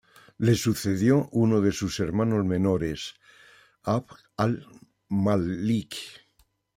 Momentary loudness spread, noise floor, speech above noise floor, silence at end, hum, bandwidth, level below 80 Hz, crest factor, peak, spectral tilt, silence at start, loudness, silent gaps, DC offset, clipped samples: 14 LU; -67 dBFS; 42 dB; 0.6 s; none; 16.5 kHz; -56 dBFS; 18 dB; -8 dBFS; -6.5 dB/octave; 0.4 s; -26 LUFS; none; under 0.1%; under 0.1%